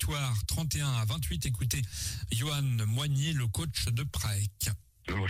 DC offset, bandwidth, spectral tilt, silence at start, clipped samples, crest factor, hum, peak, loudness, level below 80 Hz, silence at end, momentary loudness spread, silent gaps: under 0.1%; 16 kHz; -4 dB/octave; 0 s; under 0.1%; 12 dB; none; -20 dBFS; -32 LUFS; -44 dBFS; 0 s; 5 LU; none